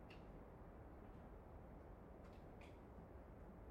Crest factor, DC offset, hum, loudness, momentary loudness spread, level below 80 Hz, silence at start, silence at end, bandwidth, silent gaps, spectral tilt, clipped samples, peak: 12 dB; under 0.1%; none; -61 LUFS; 1 LU; -64 dBFS; 0 s; 0 s; 16 kHz; none; -8 dB/octave; under 0.1%; -48 dBFS